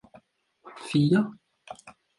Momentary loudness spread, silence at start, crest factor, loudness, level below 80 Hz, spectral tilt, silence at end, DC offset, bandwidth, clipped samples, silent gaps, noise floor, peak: 24 LU; 0.65 s; 18 dB; -25 LUFS; -68 dBFS; -7 dB/octave; 0.3 s; under 0.1%; 11.5 kHz; under 0.1%; none; -61 dBFS; -12 dBFS